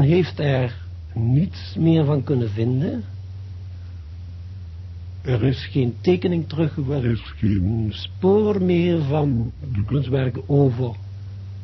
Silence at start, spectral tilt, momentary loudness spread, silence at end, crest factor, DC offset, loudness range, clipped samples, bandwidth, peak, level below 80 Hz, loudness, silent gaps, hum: 0 s; -9.5 dB/octave; 17 LU; 0 s; 16 dB; under 0.1%; 6 LU; under 0.1%; 6 kHz; -6 dBFS; -38 dBFS; -21 LUFS; none; none